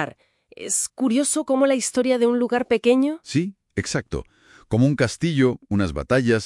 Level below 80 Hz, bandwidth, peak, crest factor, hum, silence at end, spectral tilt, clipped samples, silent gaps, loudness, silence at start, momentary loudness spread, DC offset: -46 dBFS; 12 kHz; -4 dBFS; 16 dB; none; 0 s; -5 dB/octave; under 0.1%; none; -21 LUFS; 0 s; 9 LU; under 0.1%